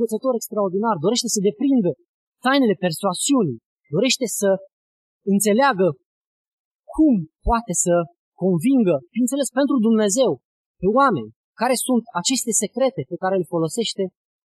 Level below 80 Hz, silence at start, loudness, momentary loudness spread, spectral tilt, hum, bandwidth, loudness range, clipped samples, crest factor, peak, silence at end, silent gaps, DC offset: -44 dBFS; 0 s; -20 LUFS; 8 LU; -4 dB/octave; none; 13 kHz; 2 LU; under 0.1%; 16 dB; -4 dBFS; 0.4 s; 2.09-2.32 s, 3.66-3.76 s, 4.73-5.20 s, 6.06-6.21 s, 6.27-6.79 s, 8.19-8.32 s, 10.45-10.74 s, 11.36-11.53 s; under 0.1%